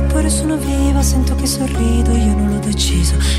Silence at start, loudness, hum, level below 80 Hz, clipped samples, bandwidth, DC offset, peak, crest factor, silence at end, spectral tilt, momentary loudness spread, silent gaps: 0 s; -16 LUFS; none; -16 dBFS; under 0.1%; 15 kHz; under 0.1%; -4 dBFS; 10 dB; 0 s; -5 dB/octave; 3 LU; none